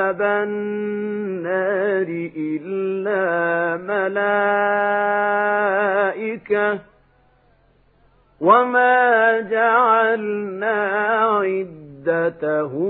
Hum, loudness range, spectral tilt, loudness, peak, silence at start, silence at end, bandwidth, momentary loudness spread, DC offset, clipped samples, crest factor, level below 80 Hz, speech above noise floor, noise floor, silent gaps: none; 5 LU; -10.5 dB/octave; -19 LUFS; 0 dBFS; 0 s; 0 s; 4 kHz; 11 LU; under 0.1%; under 0.1%; 18 dB; -66 dBFS; 38 dB; -57 dBFS; none